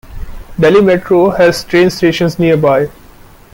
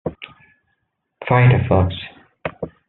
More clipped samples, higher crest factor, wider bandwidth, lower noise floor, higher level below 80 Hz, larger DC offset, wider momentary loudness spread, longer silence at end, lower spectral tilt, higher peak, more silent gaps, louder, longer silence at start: neither; second, 10 dB vs 18 dB; first, 16.5 kHz vs 4.1 kHz; second, -38 dBFS vs -72 dBFS; first, -34 dBFS vs -48 dBFS; neither; second, 5 LU vs 23 LU; first, 0.65 s vs 0.2 s; about the same, -6 dB/octave vs -6.5 dB/octave; about the same, 0 dBFS vs -2 dBFS; neither; first, -10 LUFS vs -17 LUFS; about the same, 0.1 s vs 0.05 s